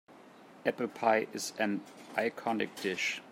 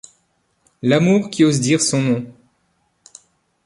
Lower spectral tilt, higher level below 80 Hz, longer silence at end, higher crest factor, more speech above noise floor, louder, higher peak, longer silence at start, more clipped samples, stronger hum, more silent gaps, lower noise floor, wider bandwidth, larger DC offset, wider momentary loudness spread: second, -3.5 dB/octave vs -5 dB/octave; second, -84 dBFS vs -60 dBFS; second, 0 s vs 1.35 s; about the same, 22 dB vs 18 dB; second, 22 dB vs 49 dB; second, -33 LUFS vs -17 LUFS; second, -12 dBFS vs -2 dBFS; second, 0.1 s vs 0.85 s; neither; neither; neither; second, -55 dBFS vs -65 dBFS; first, 16 kHz vs 11.5 kHz; neither; about the same, 7 LU vs 9 LU